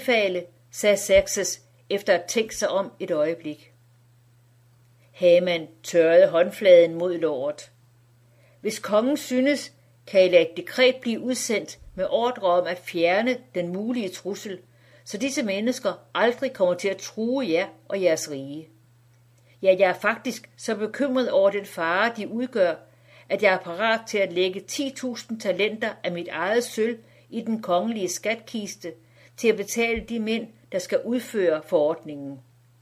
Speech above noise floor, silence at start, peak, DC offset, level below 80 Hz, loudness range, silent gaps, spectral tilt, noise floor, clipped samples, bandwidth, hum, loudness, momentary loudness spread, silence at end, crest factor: 34 dB; 0 s; -4 dBFS; under 0.1%; -58 dBFS; 6 LU; none; -3.5 dB/octave; -57 dBFS; under 0.1%; 15.5 kHz; none; -24 LUFS; 14 LU; 0.4 s; 20 dB